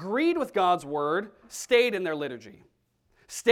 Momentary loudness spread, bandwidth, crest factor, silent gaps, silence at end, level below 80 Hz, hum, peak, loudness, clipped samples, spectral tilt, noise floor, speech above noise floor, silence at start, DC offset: 16 LU; 16 kHz; 18 dB; none; 0 s; -68 dBFS; none; -8 dBFS; -26 LUFS; under 0.1%; -3.5 dB/octave; -70 dBFS; 43 dB; 0 s; under 0.1%